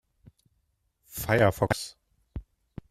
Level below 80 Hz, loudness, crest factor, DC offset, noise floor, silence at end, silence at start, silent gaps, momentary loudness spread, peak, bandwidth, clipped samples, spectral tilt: -50 dBFS; -26 LUFS; 24 dB; under 0.1%; -74 dBFS; 0.5 s; 1.1 s; none; 23 LU; -8 dBFS; 15.5 kHz; under 0.1%; -5.5 dB/octave